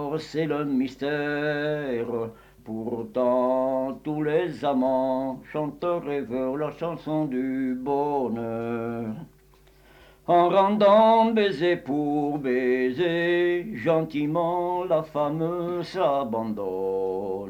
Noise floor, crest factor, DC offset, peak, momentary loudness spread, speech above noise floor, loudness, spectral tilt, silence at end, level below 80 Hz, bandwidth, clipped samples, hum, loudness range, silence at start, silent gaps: -56 dBFS; 16 dB; under 0.1%; -8 dBFS; 10 LU; 31 dB; -25 LUFS; -7.5 dB/octave; 0 s; -60 dBFS; 18 kHz; under 0.1%; none; 7 LU; 0 s; none